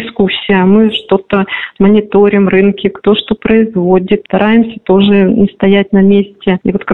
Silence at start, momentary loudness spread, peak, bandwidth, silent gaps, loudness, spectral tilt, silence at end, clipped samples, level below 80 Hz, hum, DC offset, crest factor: 0 s; 5 LU; 0 dBFS; 4.1 kHz; none; -10 LUFS; -9.5 dB/octave; 0 s; under 0.1%; -38 dBFS; none; 0.8%; 10 dB